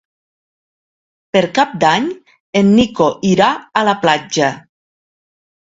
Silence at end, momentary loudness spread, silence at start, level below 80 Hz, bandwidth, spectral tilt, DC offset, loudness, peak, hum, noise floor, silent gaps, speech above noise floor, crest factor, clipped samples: 1.15 s; 7 LU; 1.35 s; -50 dBFS; 7.8 kHz; -5 dB/octave; under 0.1%; -14 LUFS; 0 dBFS; none; under -90 dBFS; 2.40-2.53 s; over 77 dB; 16 dB; under 0.1%